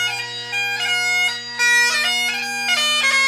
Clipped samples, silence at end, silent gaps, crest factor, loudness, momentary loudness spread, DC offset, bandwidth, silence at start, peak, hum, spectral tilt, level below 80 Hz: under 0.1%; 0 s; none; 12 dB; -17 LUFS; 8 LU; under 0.1%; 16 kHz; 0 s; -6 dBFS; none; 1 dB/octave; -70 dBFS